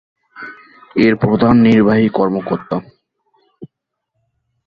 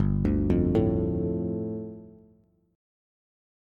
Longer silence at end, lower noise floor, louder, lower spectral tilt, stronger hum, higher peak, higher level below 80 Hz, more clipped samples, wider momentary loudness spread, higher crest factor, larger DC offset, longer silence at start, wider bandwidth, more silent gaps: second, 1 s vs 1.65 s; first, -75 dBFS vs -61 dBFS; first, -14 LUFS vs -27 LUFS; second, -9 dB/octave vs -11 dB/octave; neither; first, -2 dBFS vs -12 dBFS; second, -46 dBFS vs -38 dBFS; neither; first, 23 LU vs 14 LU; about the same, 14 dB vs 16 dB; neither; first, 0.35 s vs 0 s; about the same, 5 kHz vs 5 kHz; neither